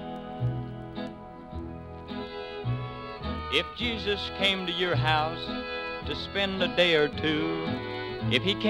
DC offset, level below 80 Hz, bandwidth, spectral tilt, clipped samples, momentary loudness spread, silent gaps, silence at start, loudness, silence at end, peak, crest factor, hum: under 0.1%; -48 dBFS; 12.5 kHz; -6 dB/octave; under 0.1%; 14 LU; none; 0 s; -29 LUFS; 0 s; -8 dBFS; 20 dB; none